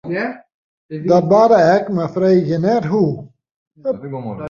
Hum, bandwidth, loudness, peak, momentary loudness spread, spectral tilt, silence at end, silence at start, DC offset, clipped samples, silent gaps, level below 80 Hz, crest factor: none; 7.2 kHz; -15 LUFS; -2 dBFS; 15 LU; -8 dB/octave; 0 s; 0.05 s; under 0.1%; under 0.1%; 0.54-0.89 s, 3.51-3.71 s; -56 dBFS; 16 dB